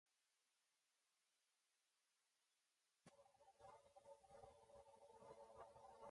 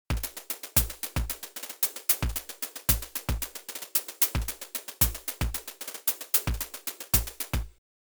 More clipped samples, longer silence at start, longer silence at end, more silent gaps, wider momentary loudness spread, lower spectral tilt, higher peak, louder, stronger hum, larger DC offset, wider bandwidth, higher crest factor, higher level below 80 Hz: neither; about the same, 0.05 s vs 0.1 s; second, 0 s vs 0.4 s; neither; second, 5 LU vs 10 LU; first, -4 dB/octave vs -2.5 dB/octave; second, -50 dBFS vs -6 dBFS; second, -67 LUFS vs -28 LUFS; neither; neither; second, 11 kHz vs over 20 kHz; about the same, 20 dB vs 24 dB; second, -90 dBFS vs -38 dBFS